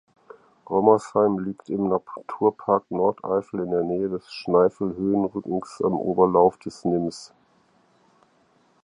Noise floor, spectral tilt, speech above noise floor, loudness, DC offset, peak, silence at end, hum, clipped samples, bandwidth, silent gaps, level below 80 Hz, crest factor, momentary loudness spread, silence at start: -62 dBFS; -7.5 dB/octave; 39 dB; -23 LUFS; under 0.1%; -2 dBFS; 1.6 s; none; under 0.1%; 10.5 kHz; none; -60 dBFS; 22 dB; 10 LU; 0.7 s